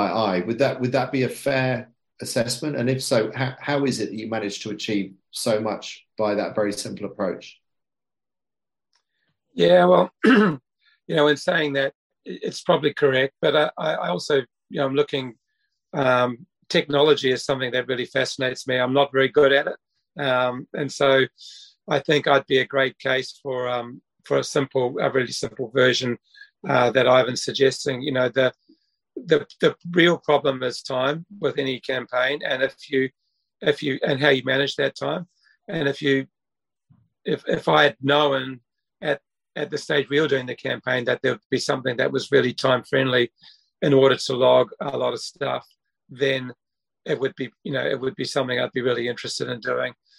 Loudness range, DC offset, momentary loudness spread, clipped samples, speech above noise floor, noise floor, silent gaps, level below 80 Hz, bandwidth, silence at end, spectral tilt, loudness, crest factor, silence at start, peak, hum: 6 LU; under 0.1%; 12 LU; under 0.1%; over 68 dB; under -90 dBFS; 11.95-12.10 s, 41.45-41.50 s; -66 dBFS; 16.5 kHz; 0.25 s; -5 dB/octave; -22 LUFS; 20 dB; 0 s; -2 dBFS; none